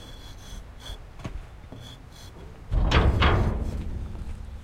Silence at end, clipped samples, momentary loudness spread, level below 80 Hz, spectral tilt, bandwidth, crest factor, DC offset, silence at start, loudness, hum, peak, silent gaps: 0 s; under 0.1%; 22 LU; -30 dBFS; -6 dB/octave; 11.5 kHz; 20 dB; under 0.1%; 0 s; -26 LUFS; none; -8 dBFS; none